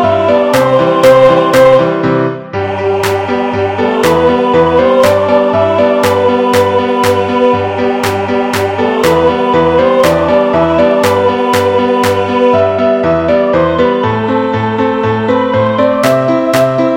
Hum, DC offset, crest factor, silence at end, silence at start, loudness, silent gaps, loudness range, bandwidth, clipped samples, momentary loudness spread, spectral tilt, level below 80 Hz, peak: none; under 0.1%; 10 dB; 0 s; 0 s; -10 LUFS; none; 2 LU; 17 kHz; 0.7%; 6 LU; -6 dB/octave; -38 dBFS; 0 dBFS